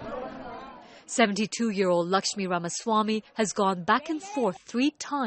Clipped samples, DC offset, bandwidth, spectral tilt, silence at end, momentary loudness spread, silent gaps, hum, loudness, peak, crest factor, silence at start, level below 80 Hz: under 0.1%; under 0.1%; 8.8 kHz; -4 dB/octave; 0 s; 15 LU; none; none; -27 LUFS; -6 dBFS; 20 dB; 0 s; -64 dBFS